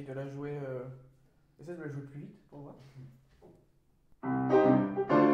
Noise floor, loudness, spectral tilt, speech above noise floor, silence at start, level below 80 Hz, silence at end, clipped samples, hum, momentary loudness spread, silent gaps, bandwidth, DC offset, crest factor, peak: -67 dBFS; -31 LUFS; -9 dB/octave; 34 dB; 0 s; -70 dBFS; 0 s; under 0.1%; none; 25 LU; none; 6.6 kHz; under 0.1%; 20 dB; -14 dBFS